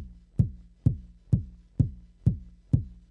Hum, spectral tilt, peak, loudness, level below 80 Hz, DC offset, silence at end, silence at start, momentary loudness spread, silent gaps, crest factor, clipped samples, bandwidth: none; -11.5 dB/octave; -8 dBFS; -30 LUFS; -40 dBFS; under 0.1%; 0.2 s; 0 s; 8 LU; none; 20 dB; under 0.1%; 2.1 kHz